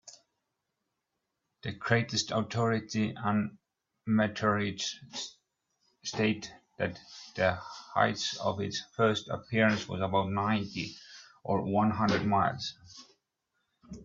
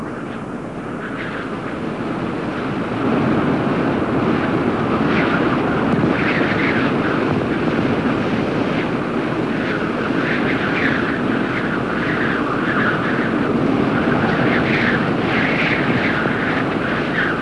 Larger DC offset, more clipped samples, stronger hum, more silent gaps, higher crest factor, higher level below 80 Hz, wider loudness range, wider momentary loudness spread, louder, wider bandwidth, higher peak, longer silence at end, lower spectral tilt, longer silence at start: second, under 0.1% vs 0.3%; neither; neither; neither; first, 24 dB vs 14 dB; second, -66 dBFS vs -44 dBFS; about the same, 3 LU vs 3 LU; first, 15 LU vs 8 LU; second, -31 LUFS vs -19 LUFS; second, 7.8 kHz vs 11 kHz; second, -10 dBFS vs -4 dBFS; about the same, 0 s vs 0 s; second, -5 dB/octave vs -7 dB/octave; about the same, 0.05 s vs 0 s